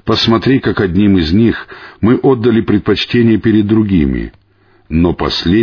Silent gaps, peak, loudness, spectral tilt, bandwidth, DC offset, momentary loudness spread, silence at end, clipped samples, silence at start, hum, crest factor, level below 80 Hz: none; 0 dBFS; -12 LUFS; -7.5 dB/octave; 5.4 kHz; under 0.1%; 7 LU; 0 s; under 0.1%; 0.05 s; none; 12 dB; -30 dBFS